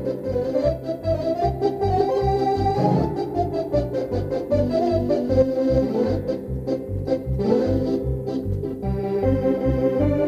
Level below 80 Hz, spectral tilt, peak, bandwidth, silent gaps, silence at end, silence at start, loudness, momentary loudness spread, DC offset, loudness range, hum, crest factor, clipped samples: -36 dBFS; -9 dB/octave; -6 dBFS; 14 kHz; none; 0 s; 0 s; -23 LUFS; 6 LU; under 0.1%; 2 LU; none; 16 dB; under 0.1%